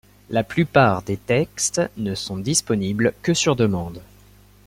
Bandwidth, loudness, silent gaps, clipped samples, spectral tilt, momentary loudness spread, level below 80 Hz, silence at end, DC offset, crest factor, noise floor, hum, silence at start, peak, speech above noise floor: 16.5 kHz; -21 LUFS; none; under 0.1%; -4.5 dB/octave; 9 LU; -50 dBFS; 0.65 s; under 0.1%; 20 dB; -50 dBFS; 50 Hz at -40 dBFS; 0.3 s; -2 dBFS; 29 dB